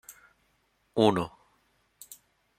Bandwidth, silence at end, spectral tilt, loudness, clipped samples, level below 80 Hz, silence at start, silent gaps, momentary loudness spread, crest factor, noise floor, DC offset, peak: 16 kHz; 1.3 s; -6 dB/octave; -27 LUFS; under 0.1%; -66 dBFS; 0.1 s; none; 26 LU; 26 dB; -71 dBFS; under 0.1%; -6 dBFS